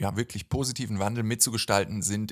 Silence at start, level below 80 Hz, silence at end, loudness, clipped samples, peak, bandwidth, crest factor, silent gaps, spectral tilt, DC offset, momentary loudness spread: 0 s; -48 dBFS; 0 s; -27 LUFS; under 0.1%; -6 dBFS; 16 kHz; 22 dB; none; -4 dB/octave; under 0.1%; 7 LU